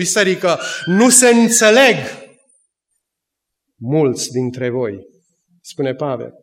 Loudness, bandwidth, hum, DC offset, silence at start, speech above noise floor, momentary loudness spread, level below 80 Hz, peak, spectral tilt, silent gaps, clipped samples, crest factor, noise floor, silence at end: -14 LUFS; 16.5 kHz; none; under 0.1%; 0 s; 65 dB; 16 LU; -68 dBFS; 0 dBFS; -3 dB/octave; none; under 0.1%; 16 dB; -80 dBFS; 0.1 s